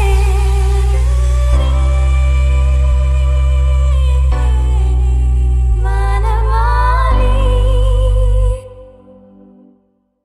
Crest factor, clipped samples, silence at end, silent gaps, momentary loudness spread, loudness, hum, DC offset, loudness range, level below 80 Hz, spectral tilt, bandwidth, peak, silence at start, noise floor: 10 dB; under 0.1%; 1.4 s; none; 2 LU; -14 LUFS; none; under 0.1%; 2 LU; -12 dBFS; -6.5 dB/octave; 10.5 kHz; -2 dBFS; 0 s; -57 dBFS